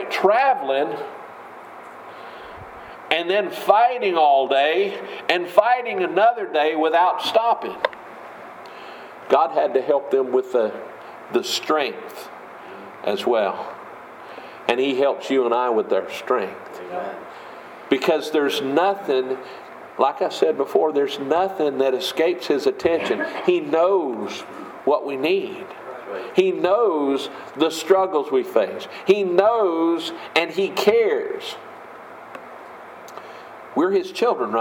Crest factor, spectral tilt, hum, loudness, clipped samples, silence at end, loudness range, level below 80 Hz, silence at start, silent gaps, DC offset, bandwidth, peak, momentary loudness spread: 22 dB; -4 dB/octave; none; -21 LUFS; under 0.1%; 0 s; 6 LU; -68 dBFS; 0 s; none; under 0.1%; 17 kHz; 0 dBFS; 20 LU